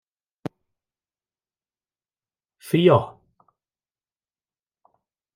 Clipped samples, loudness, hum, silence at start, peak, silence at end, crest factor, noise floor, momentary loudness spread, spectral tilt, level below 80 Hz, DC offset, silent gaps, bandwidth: under 0.1%; -19 LUFS; none; 2.65 s; -4 dBFS; 2.25 s; 24 dB; under -90 dBFS; 21 LU; -7.5 dB/octave; -68 dBFS; under 0.1%; none; 14 kHz